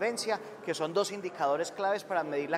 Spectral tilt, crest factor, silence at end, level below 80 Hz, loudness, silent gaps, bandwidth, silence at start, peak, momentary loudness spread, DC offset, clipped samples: -3.5 dB/octave; 16 dB; 0 s; -82 dBFS; -32 LUFS; none; 16 kHz; 0 s; -14 dBFS; 4 LU; under 0.1%; under 0.1%